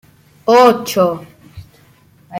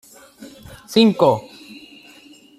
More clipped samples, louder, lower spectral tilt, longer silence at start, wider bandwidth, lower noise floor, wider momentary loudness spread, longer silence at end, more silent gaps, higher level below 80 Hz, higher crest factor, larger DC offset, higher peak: neither; first, -13 LUFS vs -17 LUFS; about the same, -5 dB/octave vs -6 dB/octave; about the same, 0.45 s vs 0.4 s; first, 16.5 kHz vs 14.5 kHz; about the same, -49 dBFS vs -47 dBFS; second, 14 LU vs 26 LU; second, 0 s vs 0.8 s; neither; about the same, -54 dBFS vs -58 dBFS; about the same, 16 dB vs 20 dB; neither; about the same, 0 dBFS vs -2 dBFS